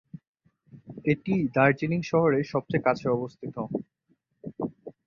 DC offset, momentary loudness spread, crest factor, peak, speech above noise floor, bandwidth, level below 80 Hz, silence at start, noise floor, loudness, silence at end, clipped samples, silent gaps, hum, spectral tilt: under 0.1%; 13 LU; 20 dB; -8 dBFS; 45 dB; 7.2 kHz; -62 dBFS; 0.15 s; -71 dBFS; -27 LUFS; 0.15 s; under 0.1%; 0.27-0.34 s; none; -8 dB/octave